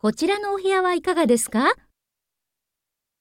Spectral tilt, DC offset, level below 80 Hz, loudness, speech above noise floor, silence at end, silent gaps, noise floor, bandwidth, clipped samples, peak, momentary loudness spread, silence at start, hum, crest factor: -3.5 dB/octave; under 0.1%; -60 dBFS; -21 LUFS; 64 dB; 1.45 s; none; -84 dBFS; 17 kHz; under 0.1%; -6 dBFS; 4 LU; 0.05 s; none; 16 dB